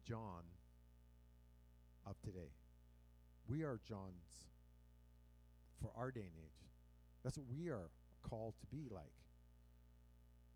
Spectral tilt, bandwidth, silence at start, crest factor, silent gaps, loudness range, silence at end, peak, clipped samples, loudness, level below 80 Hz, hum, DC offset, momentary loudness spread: -7 dB/octave; 16 kHz; 0 s; 20 dB; none; 5 LU; 0 s; -34 dBFS; under 0.1%; -52 LUFS; -66 dBFS; 60 Hz at -65 dBFS; under 0.1%; 17 LU